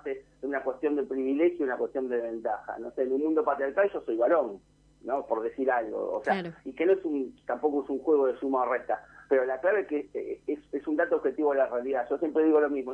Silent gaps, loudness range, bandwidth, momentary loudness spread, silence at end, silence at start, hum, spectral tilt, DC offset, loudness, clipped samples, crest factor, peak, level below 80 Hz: none; 2 LU; 5.8 kHz; 9 LU; 0 s; 0.05 s; none; -7.5 dB/octave; under 0.1%; -29 LUFS; under 0.1%; 16 dB; -12 dBFS; -66 dBFS